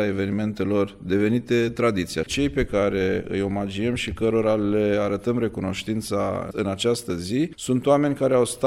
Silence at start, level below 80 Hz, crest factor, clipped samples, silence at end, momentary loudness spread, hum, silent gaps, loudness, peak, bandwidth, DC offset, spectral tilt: 0 s; -44 dBFS; 16 dB; under 0.1%; 0 s; 6 LU; none; none; -23 LUFS; -6 dBFS; 16 kHz; under 0.1%; -5.5 dB/octave